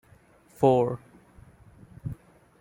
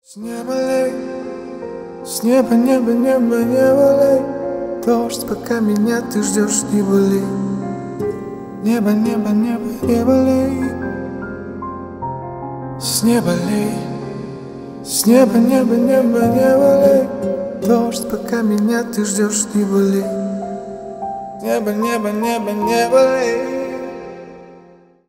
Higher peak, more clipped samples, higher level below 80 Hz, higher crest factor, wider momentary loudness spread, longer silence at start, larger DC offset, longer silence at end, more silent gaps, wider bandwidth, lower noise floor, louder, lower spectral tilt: second, -6 dBFS vs 0 dBFS; neither; second, -58 dBFS vs -48 dBFS; first, 22 dB vs 16 dB; first, 19 LU vs 16 LU; first, 0.6 s vs 0.1 s; neither; about the same, 0.45 s vs 0.5 s; neither; about the same, 16.5 kHz vs 16 kHz; first, -58 dBFS vs -46 dBFS; second, -24 LUFS vs -16 LUFS; first, -8.5 dB/octave vs -5 dB/octave